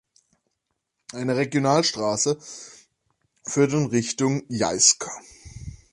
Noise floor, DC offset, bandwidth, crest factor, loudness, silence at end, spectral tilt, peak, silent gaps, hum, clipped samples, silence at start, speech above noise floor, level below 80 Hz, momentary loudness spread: -79 dBFS; under 0.1%; 11.5 kHz; 24 dB; -22 LUFS; 0.2 s; -3.5 dB/octave; -2 dBFS; none; none; under 0.1%; 1.15 s; 56 dB; -54 dBFS; 23 LU